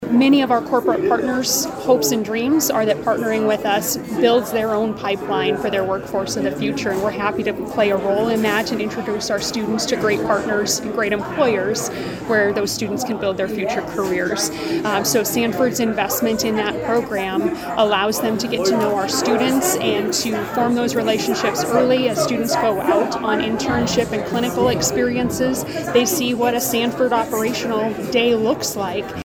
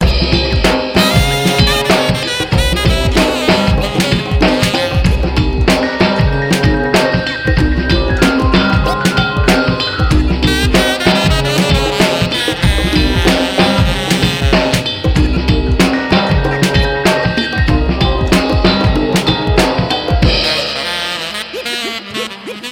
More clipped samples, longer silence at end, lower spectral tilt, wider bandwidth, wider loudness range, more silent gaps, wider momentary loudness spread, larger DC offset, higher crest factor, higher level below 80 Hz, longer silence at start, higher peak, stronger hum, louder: neither; about the same, 0 s vs 0 s; second, -3.5 dB/octave vs -5 dB/octave; first, over 20 kHz vs 17 kHz; about the same, 2 LU vs 1 LU; neither; about the same, 5 LU vs 4 LU; neither; first, 18 dB vs 12 dB; second, -48 dBFS vs -20 dBFS; about the same, 0 s vs 0 s; about the same, -2 dBFS vs 0 dBFS; neither; second, -19 LUFS vs -13 LUFS